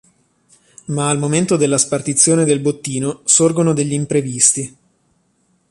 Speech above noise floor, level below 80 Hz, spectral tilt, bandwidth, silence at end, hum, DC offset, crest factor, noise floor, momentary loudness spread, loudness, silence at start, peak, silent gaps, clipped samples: 46 dB; -56 dBFS; -4 dB/octave; 11.5 kHz; 1 s; none; under 0.1%; 18 dB; -61 dBFS; 10 LU; -15 LUFS; 0.9 s; 0 dBFS; none; under 0.1%